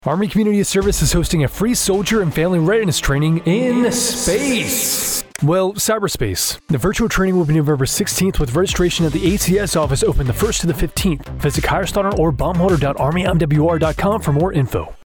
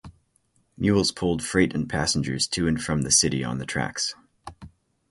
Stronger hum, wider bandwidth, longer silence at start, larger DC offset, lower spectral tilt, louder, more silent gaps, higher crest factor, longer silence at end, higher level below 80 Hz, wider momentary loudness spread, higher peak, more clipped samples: neither; first, over 20 kHz vs 11.5 kHz; about the same, 0.05 s vs 0.05 s; neither; first, -5 dB/octave vs -3.5 dB/octave; first, -17 LUFS vs -24 LUFS; neither; second, 12 dB vs 22 dB; second, 0.05 s vs 0.4 s; first, -28 dBFS vs -46 dBFS; second, 3 LU vs 10 LU; about the same, -4 dBFS vs -4 dBFS; neither